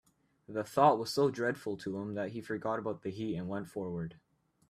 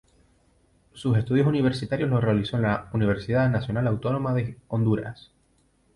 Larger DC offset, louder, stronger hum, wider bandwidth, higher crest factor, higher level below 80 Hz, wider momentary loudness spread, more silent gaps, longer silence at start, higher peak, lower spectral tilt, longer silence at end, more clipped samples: neither; second, -34 LUFS vs -25 LUFS; neither; first, 15 kHz vs 11 kHz; first, 22 dB vs 14 dB; second, -70 dBFS vs -50 dBFS; first, 13 LU vs 6 LU; neither; second, 0.5 s vs 0.95 s; about the same, -12 dBFS vs -10 dBFS; second, -6 dB/octave vs -8.5 dB/octave; second, 0.55 s vs 0.8 s; neither